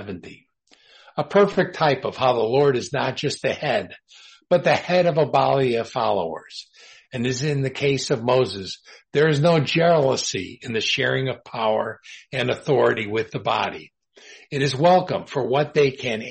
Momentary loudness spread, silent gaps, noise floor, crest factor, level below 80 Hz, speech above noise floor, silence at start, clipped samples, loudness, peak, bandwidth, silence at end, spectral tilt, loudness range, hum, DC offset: 13 LU; none; -56 dBFS; 16 dB; -60 dBFS; 35 dB; 0 s; under 0.1%; -21 LUFS; -6 dBFS; 8.8 kHz; 0 s; -5 dB/octave; 3 LU; none; under 0.1%